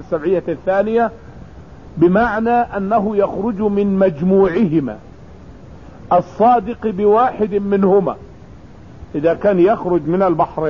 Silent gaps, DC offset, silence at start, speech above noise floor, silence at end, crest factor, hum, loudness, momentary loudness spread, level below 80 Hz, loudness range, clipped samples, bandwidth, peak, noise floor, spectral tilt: none; 0.5%; 0 s; 24 dB; 0 s; 14 dB; none; -16 LUFS; 6 LU; -42 dBFS; 2 LU; under 0.1%; 6.6 kHz; -2 dBFS; -39 dBFS; -9.5 dB/octave